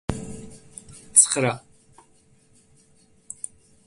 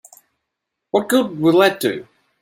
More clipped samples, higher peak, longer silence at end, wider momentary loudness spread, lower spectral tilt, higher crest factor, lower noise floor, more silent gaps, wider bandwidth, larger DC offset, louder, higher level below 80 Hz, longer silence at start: neither; about the same, 0 dBFS vs -2 dBFS; first, 2.3 s vs 0.4 s; first, 27 LU vs 9 LU; second, -2.5 dB/octave vs -5 dB/octave; first, 28 dB vs 18 dB; second, -58 dBFS vs -79 dBFS; neither; second, 12 kHz vs 16.5 kHz; neither; about the same, -18 LUFS vs -17 LUFS; first, -50 dBFS vs -66 dBFS; second, 0.1 s vs 0.95 s